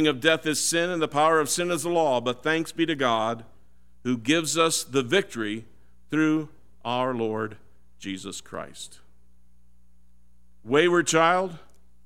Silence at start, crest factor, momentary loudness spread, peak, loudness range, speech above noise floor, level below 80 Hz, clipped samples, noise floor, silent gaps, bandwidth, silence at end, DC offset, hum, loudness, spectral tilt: 0 s; 20 dB; 16 LU; -4 dBFS; 9 LU; 37 dB; -62 dBFS; under 0.1%; -61 dBFS; none; 16.5 kHz; 0.45 s; 0.5%; none; -24 LUFS; -3.5 dB/octave